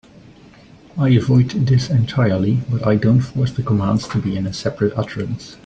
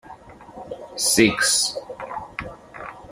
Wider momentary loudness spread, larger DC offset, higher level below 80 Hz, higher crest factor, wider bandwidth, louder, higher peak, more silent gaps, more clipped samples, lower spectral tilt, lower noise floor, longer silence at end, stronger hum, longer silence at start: second, 9 LU vs 21 LU; neither; first, -46 dBFS vs -52 dBFS; second, 14 dB vs 22 dB; second, 8 kHz vs 15.5 kHz; about the same, -18 LUFS vs -19 LUFS; about the same, -4 dBFS vs -2 dBFS; neither; neither; first, -7.5 dB/octave vs -2 dB/octave; about the same, -44 dBFS vs -43 dBFS; about the same, 0.1 s vs 0 s; neither; first, 0.95 s vs 0.05 s